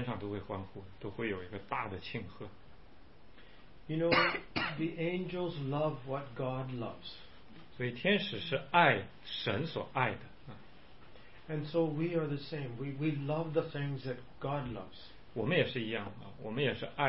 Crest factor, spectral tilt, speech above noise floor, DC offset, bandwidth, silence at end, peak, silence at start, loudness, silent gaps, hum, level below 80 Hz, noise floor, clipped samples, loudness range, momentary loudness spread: 26 dB; -4 dB/octave; 23 dB; 0.3%; 5.6 kHz; 0 s; -10 dBFS; 0 s; -35 LUFS; none; none; -62 dBFS; -59 dBFS; under 0.1%; 5 LU; 18 LU